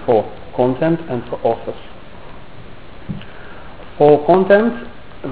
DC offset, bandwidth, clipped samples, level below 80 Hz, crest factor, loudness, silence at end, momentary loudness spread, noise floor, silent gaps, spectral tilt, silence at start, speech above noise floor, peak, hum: 2%; 4 kHz; under 0.1%; -44 dBFS; 18 dB; -15 LUFS; 0 s; 25 LU; -37 dBFS; none; -11 dB/octave; 0 s; 23 dB; 0 dBFS; none